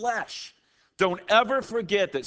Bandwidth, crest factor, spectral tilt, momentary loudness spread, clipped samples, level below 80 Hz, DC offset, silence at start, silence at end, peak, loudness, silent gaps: 8 kHz; 20 dB; -3.5 dB/octave; 16 LU; under 0.1%; -66 dBFS; under 0.1%; 0 s; 0 s; -6 dBFS; -25 LUFS; none